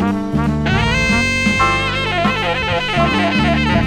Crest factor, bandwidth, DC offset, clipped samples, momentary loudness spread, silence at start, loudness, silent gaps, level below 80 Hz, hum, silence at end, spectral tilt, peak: 14 dB; 13.5 kHz; under 0.1%; under 0.1%; 3 LU; 0 s; -15 LUFS; none; -28 dBFS; 50 Hz at -30 dBFS; 0 s; -5 dB/octave; -2 dBFS